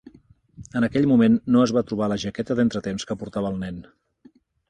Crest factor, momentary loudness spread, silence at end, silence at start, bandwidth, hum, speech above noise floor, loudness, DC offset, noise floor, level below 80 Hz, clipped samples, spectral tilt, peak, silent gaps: 16 dB; 13 LU; 0.9 s; 0.6 s; 9.4 kHz; none; 34 dB; -22 LUFS; under 0.1%; -56 dBFS; -52 dBFS; under 0.1%; -6.5 dB/octave; -6 dBFS; none